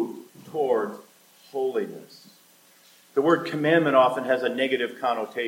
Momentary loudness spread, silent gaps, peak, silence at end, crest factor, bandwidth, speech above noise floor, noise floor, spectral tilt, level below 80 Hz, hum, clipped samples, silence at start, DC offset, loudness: 16 LU; none; -6 dBFS; 0 s; 18 dB; 17 kHz; 33 dB; -56 dBFS; -6 dB/octave; -80 dBFS; none; under 0.1%; 0 s; under 0.1%; -24 LUFS